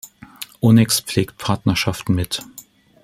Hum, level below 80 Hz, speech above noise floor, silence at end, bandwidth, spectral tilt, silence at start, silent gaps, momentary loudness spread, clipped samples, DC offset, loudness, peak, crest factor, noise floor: none; -48 dBFS; 27 dB; 0.45 s; 16.5 kHz; -5 dB/octave; 0.05 s; none; 18 LU; under 0.1%; under 0.1%; -18 LUFS; -2 dBFS; 18 dB; -45 dBFS